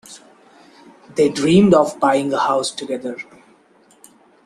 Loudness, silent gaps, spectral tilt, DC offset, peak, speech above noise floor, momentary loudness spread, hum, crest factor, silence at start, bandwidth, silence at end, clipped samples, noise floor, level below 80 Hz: -17 LUFS; none; -5.5 dB/octave; under 0.1%; 0 dBFS; 37 dB; 17 LU; none; 18 dB; 0.1 s; 13 kHz; 1.25 s; under 0.1%; -53 dBFS; -56 dBFS